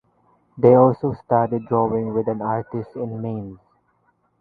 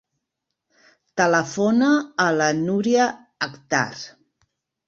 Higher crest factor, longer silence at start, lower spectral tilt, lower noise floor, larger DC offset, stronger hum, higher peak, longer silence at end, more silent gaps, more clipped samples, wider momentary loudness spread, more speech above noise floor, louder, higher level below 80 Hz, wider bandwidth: about the same, 20 dB vs 18 dB; second, 0.55 s vs 1.15 s; first, -12.5 dB/octave vs -4.5 dB/octave; second, -65 dBFS vs -81 dBFS; neither; neither; first, 0 dBFS vs -4 dBFS; about the same, 0.85 s vs 0.8 s; neither; neither; first, 15 LU vs 11 LU; second, 45 dB vs 61 dB; about the same, -20 LUFS vs -21 LUFS; first, -56 dBFS vs -66 dBFS; second, 4.7 kHz vs 7.8 kHz